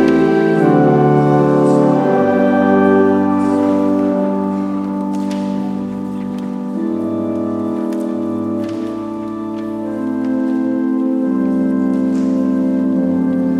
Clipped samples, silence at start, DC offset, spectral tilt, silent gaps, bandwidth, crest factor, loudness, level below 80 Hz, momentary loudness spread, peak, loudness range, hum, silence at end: under 0.1%; 0 s; under 0.1%; -8.5 dB/octave; none; 10 kHz; 14 dB; -16 LUFS; -54 dBFS; 11 LU; 0 dBFS; 8 LU; none; 0 s